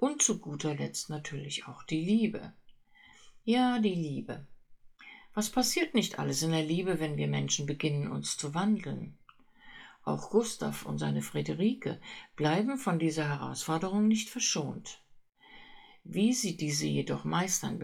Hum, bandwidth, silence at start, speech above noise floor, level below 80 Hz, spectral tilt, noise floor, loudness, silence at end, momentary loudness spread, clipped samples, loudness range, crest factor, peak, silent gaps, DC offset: none; 17 kHz; 0 s; 28 dB; -62 dBFS; -4.5 dB/octave; -59 dBFS; -31 LUFS; 0 s; 13 LU; under 0.1%; 3 LU; 18 dB; -14 dBFS; none; under 0.1%